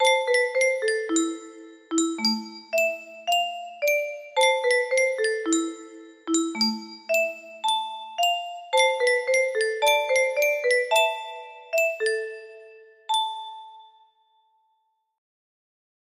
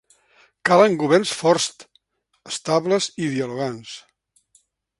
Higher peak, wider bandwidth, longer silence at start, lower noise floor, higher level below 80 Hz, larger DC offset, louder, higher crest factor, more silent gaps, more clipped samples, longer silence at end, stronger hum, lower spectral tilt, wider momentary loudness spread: second, -8 dBFS vs 0 dBFS; first, 15.5 kHz vs 11.5 kHz; second, 0 s vs 0.65 s; first, -72 dBFS vs -64 dBFS; second, -76 dBFS vs -66 dBFS; neither; second, -24 LUFS vs -20 LUFS; about the same, 18 dB vs 22 dB; neither; neither; first, 2.35 s vs 1 s; neither; second, -1 dB/octave vs -4 dB/octave; about the same, 14 LU vs 15 LU